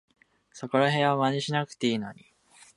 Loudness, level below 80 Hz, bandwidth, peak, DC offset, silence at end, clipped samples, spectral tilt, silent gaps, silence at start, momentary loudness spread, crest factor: -26 LUFS; -72 dBFS; 11.5 kHz; -8 dBFS; under 0.1%; 0.65 s; under 0.1%; -5.5 dB/octave; none; 0.55 s; 12 LU; 20 dB